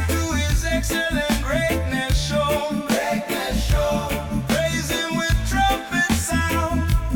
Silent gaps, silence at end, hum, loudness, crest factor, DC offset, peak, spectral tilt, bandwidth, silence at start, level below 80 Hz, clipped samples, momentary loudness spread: none; 0 s; none; -22 LUFS; 12 dB; under 0.1%; -8 dBFS; -4.5 dB/octave; 19 kHz; 0 s; -28 dBFS; under 0.1%; 3 LU